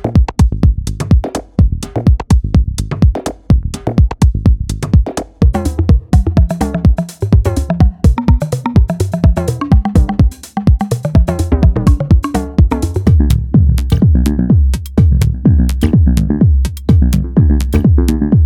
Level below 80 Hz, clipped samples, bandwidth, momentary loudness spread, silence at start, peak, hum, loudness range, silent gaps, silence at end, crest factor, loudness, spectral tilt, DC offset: -14 dBFS; under 0.1%; 14 kHz; 4 LU; 0 s; 0 dBFS; none; 2 LU; none; 0 s; 10 dB; -13 LUFS; -8 dB/octave; under 0.1%